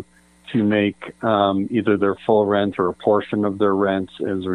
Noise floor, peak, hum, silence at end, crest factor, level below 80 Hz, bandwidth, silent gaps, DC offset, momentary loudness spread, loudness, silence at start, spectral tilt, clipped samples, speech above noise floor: -45 dBFS; -2 dBFS; none; 0 s; 18 dB; -62 dBFS; 10 kHz; none; under 0.1%; 6 LU; -20 LUFS; 0 s; -8 dB/octave; under 0.1%; 25 dB